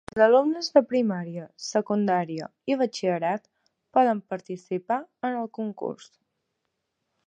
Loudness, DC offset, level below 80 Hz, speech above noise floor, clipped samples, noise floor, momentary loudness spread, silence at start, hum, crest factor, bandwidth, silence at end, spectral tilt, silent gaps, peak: -26 LUFS; under 0.1%; -72 dBFS; 55 dB; under 0.1%; -80 dBFS; 14 LU; 0.15 s; none; 22 dB; 9.2 kHz; 1.3 s; -5.5 dB/octave; none; -4 dBFS